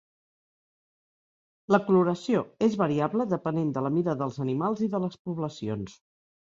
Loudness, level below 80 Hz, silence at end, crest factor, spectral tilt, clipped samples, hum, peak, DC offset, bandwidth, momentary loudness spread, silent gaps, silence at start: -27 LUFS; -66 dBFS; 0.55 s; 20 dB; -8 dB/octave; under 0.1%; none; -8 dBFS; under 0.1%; 7.8 kHz; 10 LU; 5.19-5.25 s; 1.7 s